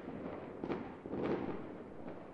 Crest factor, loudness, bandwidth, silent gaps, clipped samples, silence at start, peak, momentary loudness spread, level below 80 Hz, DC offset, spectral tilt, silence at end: 18 dB; -43 LUFS; 7.8 kHz; none; under 0.1%; 0 s; -24 dBFS; 10 LU; -66 dBFS; under 0.1%; -8.5 dB/octave; 0 s